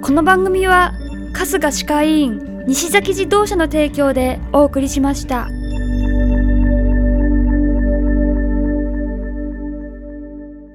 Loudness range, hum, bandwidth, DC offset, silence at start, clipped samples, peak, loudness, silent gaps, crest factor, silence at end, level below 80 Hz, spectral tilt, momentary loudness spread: 3 LU; 50 Hz at -45 dBFS; 16.5 kHz; under 0.1%; 0 s; under 0.1%; 0 dBFS; -16 LUFS; none; 16 dB; 0 s; -20 dBFS; -5 dB/octave; 13 LU